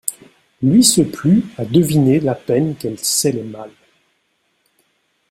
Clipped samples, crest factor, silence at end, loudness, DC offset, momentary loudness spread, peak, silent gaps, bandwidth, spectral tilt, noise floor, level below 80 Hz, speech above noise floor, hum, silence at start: under 0.1%; 18 dB; 1.6 s; -15 LUFS; under 0.1%; 13 LU; 0 dBFS; none; 16 kHz; -5 dB/octave; -65 dBFS; -52 dBFS; 50 dB; none; 0.05 s